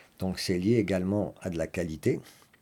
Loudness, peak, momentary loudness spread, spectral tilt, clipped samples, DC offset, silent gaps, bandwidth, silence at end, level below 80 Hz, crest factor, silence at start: -30 LUFS; -12 dBFS; 8 LU; -6.5 dB/octave; under 0.1%; under 0.1%; none; 17.5 kHz; 0.3 s; -58 dBFS; 18 dB; 0.2 s